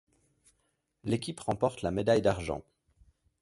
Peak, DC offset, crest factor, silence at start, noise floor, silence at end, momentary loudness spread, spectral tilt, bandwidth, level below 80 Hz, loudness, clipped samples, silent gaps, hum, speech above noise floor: -12 dBFS; under 0.1%; 20 dB; 1.05 s; -77 dBFS; 0.8 s; 12 LU; -6 dB/octave; 11.5 kHz; -54 dBFS; -31 LUFS; under 0.1%; none; none; 47 dB